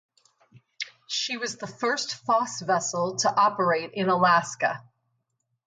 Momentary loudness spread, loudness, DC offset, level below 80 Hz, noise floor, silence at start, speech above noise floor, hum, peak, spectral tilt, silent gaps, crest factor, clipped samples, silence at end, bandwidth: 11 LU; -25 LUFS; under 0.1%; -76 dBFS; -77 dBFS; 0.8 s; 52 dB; none; -8 dBFS; -3 dB/octave; none; 20 dB; under 0.1%; 0.85 s; 9.6 kHz